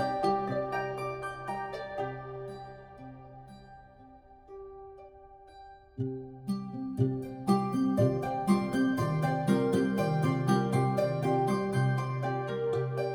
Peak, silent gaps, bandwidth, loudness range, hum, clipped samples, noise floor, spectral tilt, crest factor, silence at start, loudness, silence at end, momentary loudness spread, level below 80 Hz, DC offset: -14 dBFS; none; 18.5 kHz; 17 LU; none; under 0.1%; -54 dBFS; -7.5 dB/octave; 18 dB; 0 s; -31 LUFS; 0 s; 21 LU; -60 dBFS; under 0.1%